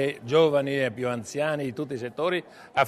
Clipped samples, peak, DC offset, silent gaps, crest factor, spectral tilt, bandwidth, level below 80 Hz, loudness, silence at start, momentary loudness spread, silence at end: under 0.1%; -8 dBFS; under 0.1%; none; 18 dB; -5.5 dB/octave; 13.5 kHz; -66 dBFS; -26 LUFS; 0 s; 10 LU; 0 s